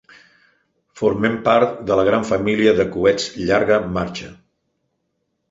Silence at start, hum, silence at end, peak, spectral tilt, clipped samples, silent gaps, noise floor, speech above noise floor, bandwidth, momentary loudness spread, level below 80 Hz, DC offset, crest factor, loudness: 0.95 s; none; 1.15 s; -2 dBFS; -5.5 dB/octave; under 0.1%; none; -72 dBFS; 55 dB; 8 kHz; 8 LU; -48 dBFS; under 0.1%; 18 dB; -18 LUFS